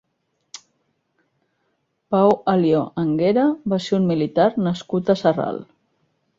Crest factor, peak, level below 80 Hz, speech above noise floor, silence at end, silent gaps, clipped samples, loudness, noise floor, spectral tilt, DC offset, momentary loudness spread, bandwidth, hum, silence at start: 18 dB; -4 dBFS; -60 dBFS; 53 dB; 0.75 s; none; under 0.1%; -20 LUFS; -72 dBFS; -7.5 dB/octave; under 0.1%; 16 LU; 7.6 kHz; none; 0.55 s